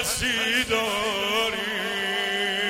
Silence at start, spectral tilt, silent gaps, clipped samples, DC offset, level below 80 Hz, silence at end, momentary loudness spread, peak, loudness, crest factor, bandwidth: 0 s; -1.5 dB/octave; none; under 0.1%; under 0.1%; -50 dBFS; 0 s; 4 LU; -10 dBFS; -24 LUFS; 16 dB; 16.5 kHz